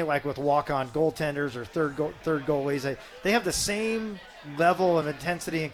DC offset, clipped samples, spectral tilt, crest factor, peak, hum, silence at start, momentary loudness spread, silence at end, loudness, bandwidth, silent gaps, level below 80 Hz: under 0.1%; under 0.1%; -4.5 dB/octave; 16 dB; -10 dBFS; none; 0 s; 7 LU; 0 s; -27 LUFS; 18.5 kHz; none; -54 dBFS